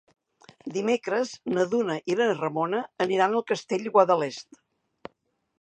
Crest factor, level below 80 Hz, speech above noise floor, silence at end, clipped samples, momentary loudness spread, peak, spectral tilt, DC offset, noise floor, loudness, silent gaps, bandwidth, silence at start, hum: 22 dB; -76 dBFS; 46 dB; 1.2 s; under 0.1%; 8 LU; -4 dBFS; -5 dB/octave; under 0.1%; -71 dBFS; -26 LUFS; none; 9.2 kHz; 0.65 s; none